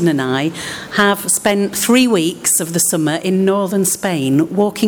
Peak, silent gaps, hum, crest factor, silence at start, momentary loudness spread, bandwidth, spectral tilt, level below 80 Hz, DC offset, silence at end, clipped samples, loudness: -2 dBFS; none; none; 12 dB; 0 s; 5 LU; over 20 kHz; -4 dB/octave; -54 dBFS; under 0.1%; 0 s; under 0.1%; -15 LUFS